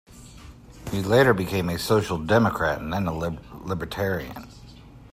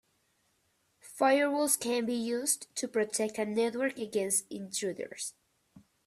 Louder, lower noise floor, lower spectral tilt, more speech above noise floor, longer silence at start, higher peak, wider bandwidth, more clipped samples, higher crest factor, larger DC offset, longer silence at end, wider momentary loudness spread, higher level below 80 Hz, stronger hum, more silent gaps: first, -24 LUFS vs -31 LUFS; second, -46 dBFS vs -74 dBFS; first, -6 dB/octave vs -2.5 dB/octave; second, 22 dB vs 43 dB; second, 0.1 s vs 1.05 s; first, -6 dBFS vs -10 dBFS; about the same, 16 kHz vs 15.5 kHz; neither; about the same, 18 dB vs 22 dB; neither; second, 0.1 s vs 0.25 s; first, 19 LU vs 10 LU; first, -46 dBFS vs -78 dBFS; neither; neither